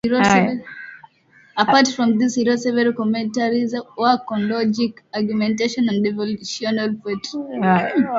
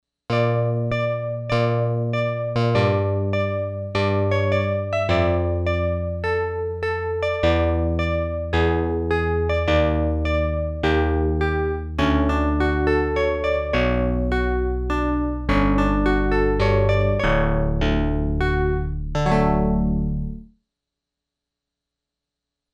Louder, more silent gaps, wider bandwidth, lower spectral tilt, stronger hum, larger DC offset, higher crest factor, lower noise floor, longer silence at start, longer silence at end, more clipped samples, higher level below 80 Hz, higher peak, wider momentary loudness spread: first, -19 LUFS vs -22 LUFS; neither; about the same, 7.8 kHz vs 8.4 kHz; second, -5 dB/octave vs -8 dB/octave; neither; neither; about the same, 18 dB vs 16 dB; second, -53 dBFS vs -84 dBFS; second, 0.05 s vs 0.3 s; second, 0 s vs 2.3 s; neither; second, -58 dBFS vs -28 dBFS; first, 0 dBFS vs -6 dBFS; first, 11 LU vs 5 LU